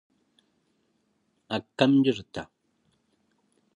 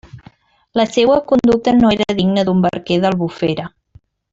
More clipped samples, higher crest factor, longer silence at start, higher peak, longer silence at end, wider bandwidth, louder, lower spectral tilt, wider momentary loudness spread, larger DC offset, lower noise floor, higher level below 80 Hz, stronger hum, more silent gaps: neither; first, 24 dB vs 14 dB; first, 1.5 s vs 0.15 s; second, -6 dBFS vs -2 dBFS; first, 1.35 s vs 0.65 s; about the same, 8.4 kHz vs 8 kHz; second, -25 LUFS vs -15 LUFS; about the same, -6.5 dB/octave vs -6.5 dB/octave; first, 18 LU vs 8 LU; neither; first, -73 dBFS vs -49 dBFS; second, -66 dBFS vs -46 dBFS; neither; neither